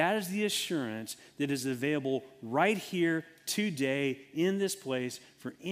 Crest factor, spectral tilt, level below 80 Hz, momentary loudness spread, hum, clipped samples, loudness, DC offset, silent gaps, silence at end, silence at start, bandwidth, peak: 20 dB; -4.5 dB/octave; -78 dBFS; 10 LU; none; under 0.1%; -32 LUFS; under 0.1%; none; 0 s; 0 s; 16 kHz; -12 dBFS